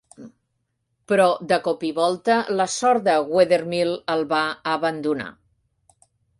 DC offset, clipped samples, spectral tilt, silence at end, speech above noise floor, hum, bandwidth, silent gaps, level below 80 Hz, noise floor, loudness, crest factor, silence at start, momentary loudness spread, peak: under 0.1%; under 0.1%; -4 dB/octave; 1.1 s; 53 dB; none; 11.5 kHz; none; -66 dBFS; -74 dBFS; -21 LUFS; 18 dB; 0.2 s; 6 LU; -4 dBFS